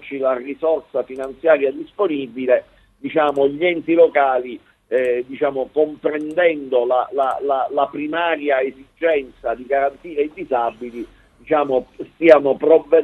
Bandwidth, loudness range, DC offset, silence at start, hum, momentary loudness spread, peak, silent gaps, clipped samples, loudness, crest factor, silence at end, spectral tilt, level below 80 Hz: 8.6 kHz; 3 LU; under 0.1%; 0 s; none; 11 LU; 0 dBFS; none; under 0.1%; -19 LUFS; 18 dB; 0 s; -6.5 dB/octave; -58 dBFS